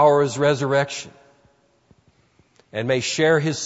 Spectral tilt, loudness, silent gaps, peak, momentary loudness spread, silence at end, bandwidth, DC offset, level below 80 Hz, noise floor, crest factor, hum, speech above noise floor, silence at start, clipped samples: -4.5 dB/octave; -21 LUFS; none; -4 dBFS; 14 LU; 0 s; 8 kHz; under 0.1%; -64 dBFS; -60 dBFS; 18 dB; none; 41 dB; 0 s; under 0.1%